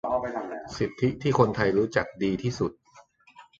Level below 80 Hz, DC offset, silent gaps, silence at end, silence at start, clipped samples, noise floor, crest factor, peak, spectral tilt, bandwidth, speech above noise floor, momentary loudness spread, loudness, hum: -54 dBFS; under 0.1%; none; 0.15 s; 0.05 s; under 0.1%; -56 dBFS; 22 dB; -6 dBFS; -6.5 dB/octave; 7.8 kHz; 30 dB; 10 LU; -27 LUFS; none